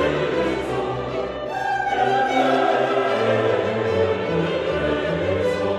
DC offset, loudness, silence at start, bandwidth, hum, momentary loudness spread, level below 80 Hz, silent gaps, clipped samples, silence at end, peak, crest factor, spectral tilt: under 0.1%; -21 LUFS; 0 s; 12 kHz; none; 7 LU; -46 dBFS; none; under 0.1%; 0 s; -8 dBFS; 14 dB; -6 dB/octave